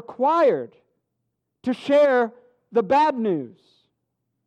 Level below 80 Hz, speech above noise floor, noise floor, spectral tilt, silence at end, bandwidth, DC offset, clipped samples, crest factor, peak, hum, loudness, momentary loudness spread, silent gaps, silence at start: -70 dBFS; 57 dB; -78 dBFS; -6.5 dB/octave; 0.95 s; 9 kHz; under 0.1%; under 0.1%; 14 dB; -10 dBFS; none; -21 LUFS; 12 LU; none; 0.1 s